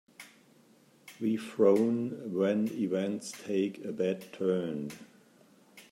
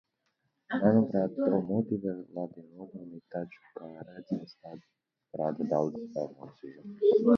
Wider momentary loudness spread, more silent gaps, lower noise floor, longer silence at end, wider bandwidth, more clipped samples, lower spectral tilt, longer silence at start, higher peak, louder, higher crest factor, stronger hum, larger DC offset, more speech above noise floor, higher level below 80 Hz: second, 13 LU vs 22 LU; neither; second, -62 dBFS vs -79 dBFS; about the same, 0.1 s vs 0 s; first, 16 kHz vs 6.4 kHz; neither; second, -6.5 dB/octave vs -9.5 dB/octave; second, 0.2 s vs 0.7 s; about the same, -12 dBFS vs -10 dBFS; about the same, -31 LUFS vs -31 LUFS; about the same, 20 dB vs 20 dB; neither; neither; second, 32 dB vs 48 dB; second, -80 dBFS vs -72 dBFS